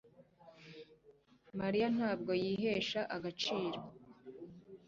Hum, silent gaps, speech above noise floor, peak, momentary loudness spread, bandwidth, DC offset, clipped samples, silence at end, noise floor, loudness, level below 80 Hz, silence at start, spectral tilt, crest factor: none; none; 30 dB; -22 dBFS; 21 LU; 7.6 kHz; under 0.1%; under 0.1%; 0.1 s; -66 dBFS; -37 LUFS; -72 dBFS; 0.2 s; -3.5 dB/octave; 16 dB